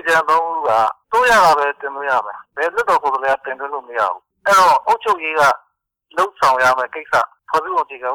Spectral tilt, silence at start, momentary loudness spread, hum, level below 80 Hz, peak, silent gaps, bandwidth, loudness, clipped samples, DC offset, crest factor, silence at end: -2 dB/octave; 0.05 s; 11 LU; none; -52 dBFS; -6 dBFS; none; over 20 kHz; -16 LUFS; under 0.1%; under 0.1%; 12 dB; 0 s